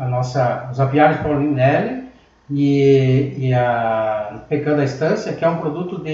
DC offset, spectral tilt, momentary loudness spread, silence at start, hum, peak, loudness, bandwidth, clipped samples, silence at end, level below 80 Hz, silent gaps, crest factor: under 0.1%; -8 dB/octave; 10 LU; 0 s; none; -2 dBFS; -18 LUFS; 7.4 kHz; under 0.1%; 0 s; -48 dBFS; none; 16 dB